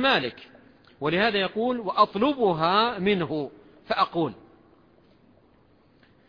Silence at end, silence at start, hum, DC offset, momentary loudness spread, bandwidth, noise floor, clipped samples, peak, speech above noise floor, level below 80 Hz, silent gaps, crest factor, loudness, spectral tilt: 1.95 s; 0 s; none; under 0.1%; 10 LU; 5.2 kHz; -60 dBFS; under 0.1%; -6 dBFS; 35 dB; -60 dBFS; none; 20 dB; -24 LUFS; -7 dB/octave